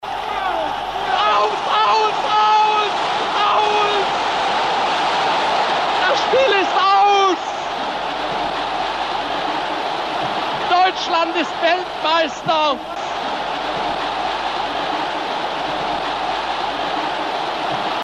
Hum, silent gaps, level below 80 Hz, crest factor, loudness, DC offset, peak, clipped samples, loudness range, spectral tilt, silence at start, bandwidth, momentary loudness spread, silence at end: none; none; -50 dBFS; 12 dB; -18 LUFS; under 0.1%; -6 dBFS; under 0.1%; 5 LU; -3 dB/octave; 0 s; 11.5 kHz; 8 LU; 0 s